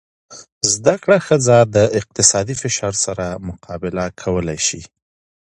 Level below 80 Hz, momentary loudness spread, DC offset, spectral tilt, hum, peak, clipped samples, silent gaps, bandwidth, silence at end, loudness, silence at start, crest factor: -44 dBFS; 13 LU; under 0.1%; -3.5 dB/octave; none; 0 dBFS; under 0.1%; 0.52-0.61 s; 11.5 kHz; 0.55 s; -16 LUFS; 0.3 s; 18 dB